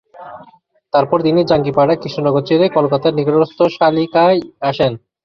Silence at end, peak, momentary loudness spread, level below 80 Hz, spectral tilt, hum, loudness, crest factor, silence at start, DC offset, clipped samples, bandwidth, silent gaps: 0.3 s; 0 dBFS; 5 LU; -52 dBFS; -8 dB/octave; none; -15 LUFS; 14 dB; 0.2 s; under 0.1%; under 0.1%; 6.6 kHz; none